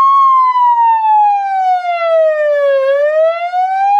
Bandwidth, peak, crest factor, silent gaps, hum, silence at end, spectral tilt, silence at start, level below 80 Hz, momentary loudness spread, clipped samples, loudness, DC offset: 7.8 kHz; -4 dBFS; 6 dB; none; none; 0 s; 1.5 dB/octave; 0 s; under -90 dBFS; 5 LU; under 0.1%; -11 LUFS; under 0.1%